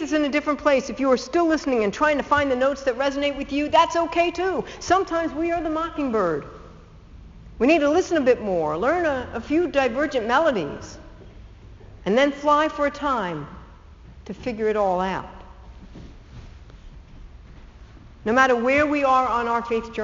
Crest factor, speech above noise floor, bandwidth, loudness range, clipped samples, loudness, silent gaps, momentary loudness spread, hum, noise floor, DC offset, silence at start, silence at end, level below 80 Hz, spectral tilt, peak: 20 dB; 23 dB; 7.6 kHz; 8 LU; under 0.1%; -22 LUFS; none; 11 LU; none; -45 dBFS; under 0.1%; 0 s; 0 s; -46 dBFS; -3 dB/octave; -2 dBFS